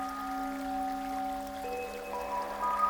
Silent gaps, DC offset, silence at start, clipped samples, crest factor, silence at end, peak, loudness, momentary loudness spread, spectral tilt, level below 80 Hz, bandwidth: none; under 0.1%; 0 s; under 0.1%; 18 dB; 0 s; -18 dBFS; -36 LUFS; 4 LU; -4 dB/octave; -56 dBFS; over 20 kHz